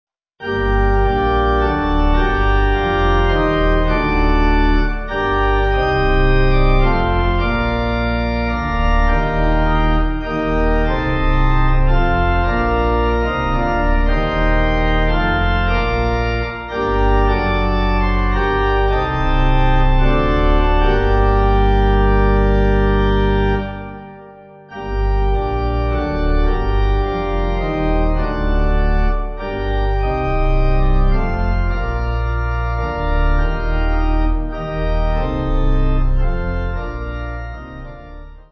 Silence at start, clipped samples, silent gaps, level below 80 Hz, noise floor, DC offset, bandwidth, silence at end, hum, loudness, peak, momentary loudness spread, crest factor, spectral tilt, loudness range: 0.4 s; under 0.1%; none; -18 dBFS; -39 dBFS; under 0.1%; 6 kHz; 0.1 s; none; -18 LUFS; -2 dBFS; 6 LU; 14 dB; -8.5 dB/octave; 4 LU